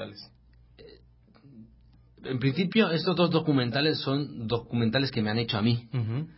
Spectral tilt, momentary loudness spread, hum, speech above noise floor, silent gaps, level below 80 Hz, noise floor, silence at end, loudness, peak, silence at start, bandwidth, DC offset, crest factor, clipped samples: -10.5 dB/octave; 8 LU; none; 31 dB; none; -58 dBFS; -57 dBFS; 0.05 s; -27 LUFS; -10 dBFS; 0 s; 5.8 kHz; under 0.1%; 18 dB; under 0.1%